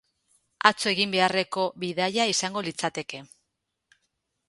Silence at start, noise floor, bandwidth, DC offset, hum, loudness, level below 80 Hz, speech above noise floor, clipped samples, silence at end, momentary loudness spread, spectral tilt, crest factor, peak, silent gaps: 0.65 s; -80 dBFS; 11.5 kHz; under 0.1%; none; -25 LUFS; -72 dBFS; 54 dB; under 0.1%; 1.25 s; 10 LU; -2.5 dB/octave; 28 dB; 0 dBFS; none